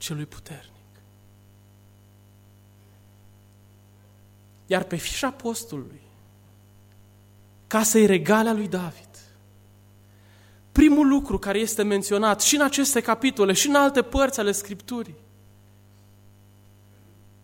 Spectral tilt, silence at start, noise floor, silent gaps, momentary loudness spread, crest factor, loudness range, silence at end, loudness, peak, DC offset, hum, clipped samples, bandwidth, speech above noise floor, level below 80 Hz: -3.5 dB/octave; 0 s; -53 dBFS; none; 18 LU; 20 dB; 11 LU; 2.3 s; -22 LUFS; -4 dBFS; under 0.1%; 50 Hz at -50 dBFS; under 0.1%; 16.5 kHz; 31 dB; -44 dBFS